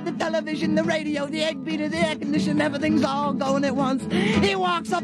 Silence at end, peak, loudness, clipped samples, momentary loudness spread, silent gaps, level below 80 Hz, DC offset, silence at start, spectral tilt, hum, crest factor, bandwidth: 0 s; -8 dBFS; -23 LUFS; under 0.1%; 5 LU; none; -56 dBFS; under 0.1%; 0 s; -5.5 dB/octave; none; 14 dB; 12 kHz